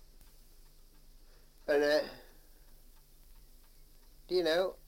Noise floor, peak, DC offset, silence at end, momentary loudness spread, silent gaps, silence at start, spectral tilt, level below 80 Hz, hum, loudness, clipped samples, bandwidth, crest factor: -57 dBFS; -18 dBFS; under 0.1%; 0.15 s; 17 LU; none; 1.15 s; -4 dB/octave; -58 dBFS; none; -32 LUFS; under 0.1%; 16.5 kHz; 20 dB